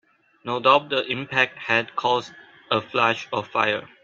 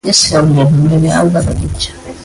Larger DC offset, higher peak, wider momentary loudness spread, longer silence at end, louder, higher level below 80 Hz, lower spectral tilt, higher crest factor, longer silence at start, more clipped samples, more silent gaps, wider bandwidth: neither; about the same, -2 dBFS vs 0 dBFS; about the same, 8 LU vs 10 LU; first, 0.2 s vs 0 s; second, -22 LUFS vs -11 LUFS; second, -68 dBFS vs -28 dBFS; about the same, -4.5 dB/octave vs -5 dB/octave; first, 22 dB vs 10 dB; first, 0.45 s vs 0.05 s; neither; neither; second, 7.6 kHz vs 11.5 kHz